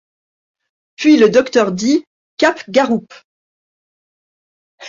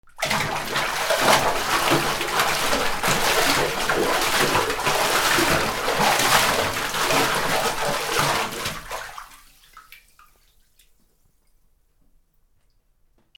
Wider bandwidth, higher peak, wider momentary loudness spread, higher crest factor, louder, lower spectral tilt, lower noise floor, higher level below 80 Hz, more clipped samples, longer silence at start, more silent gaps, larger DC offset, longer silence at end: second, 7.6 kHz vs over 20 kHz; about the same, -2 dBFS vs -2 dBFS; about the same, 8 LU vs 6 LU; second, 16 dB vs 22 dB; first, -14 LUFS vs -20 LUFS; first, -4.5 dB/octave vs -2 dB/octave; first, under -90 dBFS vs -62 dBFS; second, -60 dBFS vs -44 dBFS; neither; first, 1 s vs 0.15 s; first, 2.07-2.37 s, 3.24-4.78 s vs none; neither; second, 0 s vs 3.45 s